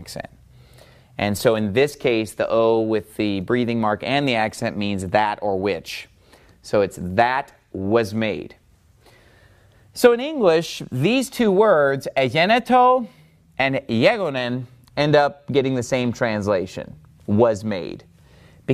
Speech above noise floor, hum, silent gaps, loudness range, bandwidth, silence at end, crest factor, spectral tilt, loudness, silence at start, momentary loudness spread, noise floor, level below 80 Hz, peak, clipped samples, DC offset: 35 dB; none; none; 5 LU; 15.5 kHz; 0 s; 18 dB; -5.5 dB/octave; -20 LUFS; 0 s; 16 LU; -55 dBFS; -54 dBFS; -2 dBFS; under 0.1%; under 0.1%